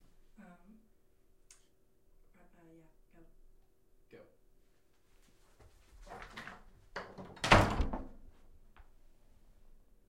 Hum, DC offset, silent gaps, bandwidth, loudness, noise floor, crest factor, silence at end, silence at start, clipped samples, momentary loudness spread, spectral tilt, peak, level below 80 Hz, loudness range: none; under 0.1%; none; 16 kHz; -32 LUFS; -71 dBFS; 32 dB; 1.95 s; 4.15 s; under 0.1%; 30 LU; -5 dB/octave; -8 dBFS; -48 dBFS; 21 LU